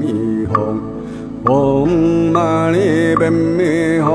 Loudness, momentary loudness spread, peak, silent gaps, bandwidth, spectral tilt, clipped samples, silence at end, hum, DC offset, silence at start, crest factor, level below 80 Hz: -15 LUFS; 8 LU; 0 dBFS; none; 11 kHz; -7.5 dB/octave; under 0.1%; 0 s; none; under 0.1%; 0 s; 14 dB; -40 dBFS